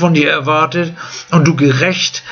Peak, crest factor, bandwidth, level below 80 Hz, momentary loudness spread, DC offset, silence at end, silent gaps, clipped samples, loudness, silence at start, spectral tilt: 0 dBFS; 12 dB; 7.2 kHz; -52 dBFS; 8 LU; under 0.1%; 0 s; none; under 0.1%; -13 LUFS; 0 s; -5 dB/octave